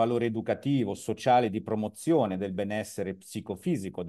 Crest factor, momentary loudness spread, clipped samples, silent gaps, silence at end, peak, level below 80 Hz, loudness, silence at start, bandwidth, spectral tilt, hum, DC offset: 18 dB; 11 LU; under 0.1%; none; 0 s; -12 dBFS; -70 dBFS; -29 LUFS; 0 s; 12.5 kHz; -6.5 dB/octave; none; under 0.1%